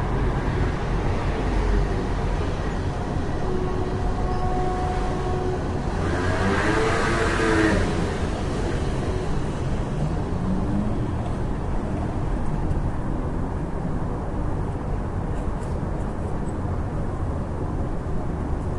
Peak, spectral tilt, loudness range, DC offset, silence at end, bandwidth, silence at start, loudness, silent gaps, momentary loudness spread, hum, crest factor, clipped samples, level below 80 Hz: -8 dBFS; -7 dB/octave; 6 LU; under 0.1%; 0 s; 11.5 kHz; 0 s; -26 LUFS; none; 7 LU; none; 16 dB; under 0.1%; -28 dBFS